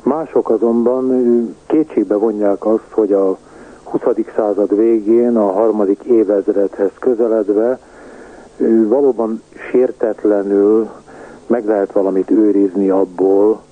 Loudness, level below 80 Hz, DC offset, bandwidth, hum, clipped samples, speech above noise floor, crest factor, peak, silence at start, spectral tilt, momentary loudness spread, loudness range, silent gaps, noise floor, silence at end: -15 LUFS; -54 dBFS; under 0.1%; 9.2 kHz; none; under 0.1%; 23 dB; 12 dB; -2 dBFS; 0.05 s; -9 dB/octave; 6 LU; 2 LU; none; -37 dBFS; 0.15 s